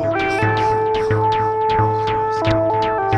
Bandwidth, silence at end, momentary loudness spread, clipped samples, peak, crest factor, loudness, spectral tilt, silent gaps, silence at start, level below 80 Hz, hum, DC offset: 9.8 kHz; 0 s; 2 LU; under 0.1%; -4 dBFS; 14 dB; -18 LUFS; -7 dB/octave; none; 0 s; -40 dBFS; none; under 0.1%